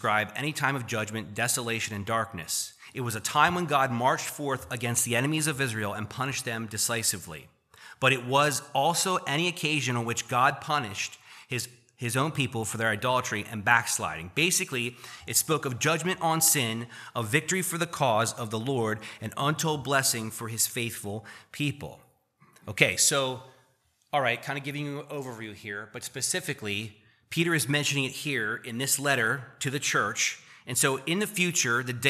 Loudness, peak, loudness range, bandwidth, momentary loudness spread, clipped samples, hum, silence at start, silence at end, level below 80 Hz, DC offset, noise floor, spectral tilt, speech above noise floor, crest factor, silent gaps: -27 LUFS; -2 dBFS; 4 LU; 15 kHz; 13 LU; under 0.1%; none; 0 s; 0 s; -66 dBFS; under 0.1%; -68 dBFS; -3 dB/octave; 40 dB; 26 dB; none